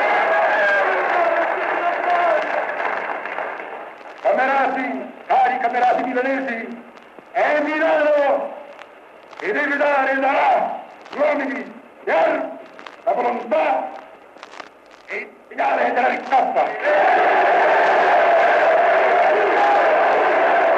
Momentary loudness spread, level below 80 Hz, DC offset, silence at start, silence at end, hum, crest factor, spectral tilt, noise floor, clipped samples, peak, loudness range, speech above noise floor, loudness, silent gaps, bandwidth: 16 LU; -72 dBFS; under 0.1%; 0 s; 0 s; none; 12 dB; -4 dB/octave; -43 dBFS; under 0.1%; -6 dBFS; 7 LU; 25 dB; -18 LUFS; none; 8.4 kHz